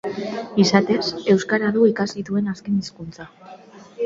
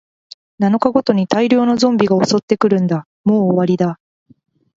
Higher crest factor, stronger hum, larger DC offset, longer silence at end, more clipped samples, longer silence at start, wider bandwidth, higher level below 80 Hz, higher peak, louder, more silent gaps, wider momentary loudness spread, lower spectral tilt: about the same, 20 dB vs 16 dB; neither; neither; second, 0 s vs 0.85 s; neither; second, 0.05 s vs 0.6 s; about the same, 7.6 kHz vs 7.8 kHz; about the same, -58 dBFS vs -58 dBFS; about the same, 0 dBFS vs 0 dBFS; second, -20 LUFS vs -15 LUFS; second, none vs 2.43-2.48 s, 3.06-3.24 s; first, 19 LU vs 6 LU; about the same, -5.5 dB/octave vs -6.5 dB/octave